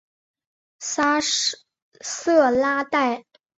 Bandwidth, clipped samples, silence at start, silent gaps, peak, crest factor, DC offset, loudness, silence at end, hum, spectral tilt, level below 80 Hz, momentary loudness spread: 8.4 kHz; under 0.1%; 0.8 s; 1.82-1.92 s; -6 dBFS; 18 dB; under 0.1%; -21 LUFS; 0.4 s; none; -1 dB/octave; -64 dBFS; 15 LU